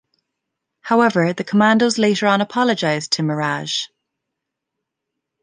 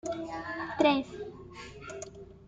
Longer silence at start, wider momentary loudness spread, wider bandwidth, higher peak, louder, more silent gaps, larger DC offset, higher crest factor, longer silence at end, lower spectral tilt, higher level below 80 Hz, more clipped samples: first, 0.85 s vs 0.05 s; second, 8 LU vs 20 LU; about the same, 10 kHz vs 9.4 kHz; first, -2 dBFS vs -10 dBFS; first, -17 LUFS vs -30 LUFS; neither; neither; about the same, 18 dB vs 22 dB; first, 1.55 s vs 0 s; about the same, -4.5 dB/octave vs -4.5 dB/octave; second, -66 dBFS vs -60 dBFS; neither